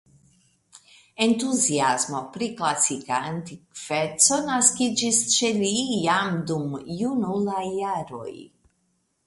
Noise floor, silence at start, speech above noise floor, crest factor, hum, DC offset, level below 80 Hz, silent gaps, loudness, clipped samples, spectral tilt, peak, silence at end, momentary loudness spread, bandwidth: -71 dBFS; 1.2 s; 47 dB; 22 dB; none; under 0.1%; -64 dBFS; none; -23 LUFS; under 0.1%; -2.5 dB/octave; -4 dBFS; 0.8 s; 13 LU; 11.5 kHz